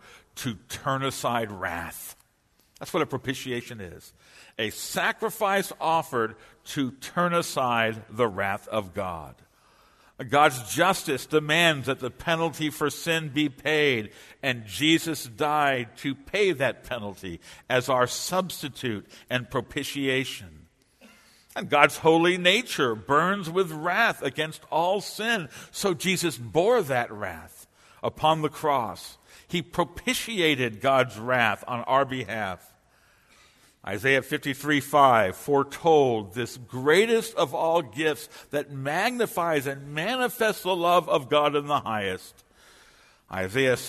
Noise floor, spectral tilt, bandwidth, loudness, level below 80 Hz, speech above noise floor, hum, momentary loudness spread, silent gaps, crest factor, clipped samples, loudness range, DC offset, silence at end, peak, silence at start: -66 dBFS; -4 dB/octave; 13.5 kHz; -25 LUFS; -60 dBFS; 40 dB; none; 13 LU; none; 26 dB; under 0.1%; 6 LU; under 0.1%; 0 s; 0 dBFS; 0.15 s